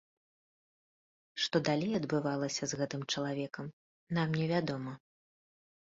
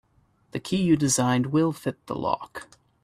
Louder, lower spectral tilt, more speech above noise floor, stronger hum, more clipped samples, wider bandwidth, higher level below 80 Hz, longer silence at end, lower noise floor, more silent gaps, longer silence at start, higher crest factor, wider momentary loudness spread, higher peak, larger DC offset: second, -34 LUFS vs -25 LUFS; about the same, -4.5 dB/octave vs -5 dB/octave; first, over 56 dB vs 39 dB; neither; neither; second, 7.6 kHz vs 15 kHz; second, -72 dBFS vs -58 dBFS; first, 0.95 s vs 0.4 s; first, under -90 dBFS vs -64 dBFS; first, 3.73-4.07 s vs none; first, 1.35 s vs 0.55 s; about the same, 20 dB vs 18 dB; about the same, 14 LU vs 16 LU; second, -16 dBFS vs -8 dBFS; neither